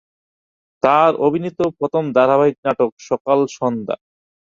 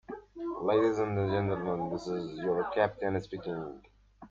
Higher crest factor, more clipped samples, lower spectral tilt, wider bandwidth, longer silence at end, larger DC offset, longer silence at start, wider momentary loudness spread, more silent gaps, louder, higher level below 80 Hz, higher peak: about the same, 16 dB vs 18 dB; neither; about the same, -6.5 dB/octave vs -7.5 dB/octave; about the same, 7.4 kHz vs 7.6 kHz; first, 0.55 s vs 0.05 s; neither; first, 0.85 s vs 0.1 s; about the same, 10 LU vs 12 LU; first, 2.58-2.63 s, 2.92-2.97 s, 3.20-3.25 s vs none; first, -17 LUFS vs -32 LUFS; about the same, -60 dBFS vs -60 dBFS; first, -2 dBFS vs -14 dBFS